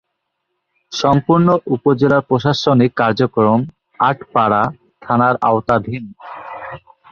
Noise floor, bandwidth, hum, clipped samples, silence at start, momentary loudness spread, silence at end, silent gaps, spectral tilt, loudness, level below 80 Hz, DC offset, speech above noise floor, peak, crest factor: -73 dBFS; 7 kHz; none; under 0.1%; 0.9 s; 17 LU; 0.35 s; none; -7 dB/octave; -15 LUFS; -50 dBFS; under 0.1%; 59 dB; -2 dBFS; 14 dB